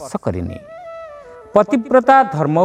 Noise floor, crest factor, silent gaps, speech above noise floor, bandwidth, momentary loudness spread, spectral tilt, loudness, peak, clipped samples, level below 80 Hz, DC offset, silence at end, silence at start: -37 dBFS; 16 dB; none; 22 dB; 10.5 kHz; 22 LU; -7 dB/octave; -15 LUFS; 0 dBFS; under 0.1%; -48 dBFS; under 0.1%; 0 s; 0 s